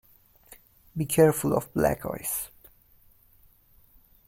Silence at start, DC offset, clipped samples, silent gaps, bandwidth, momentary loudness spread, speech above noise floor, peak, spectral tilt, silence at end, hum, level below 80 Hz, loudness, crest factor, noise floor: 0.5 s; under 0.1%; under 0.1%; none; 16.5 kHz; 14 LU; 34 dB; -8 dBFS; -5.5 dB/octave; 1.8 s; none; -54 dBFS; -26 LUFS; 22 dB; -59 dBFS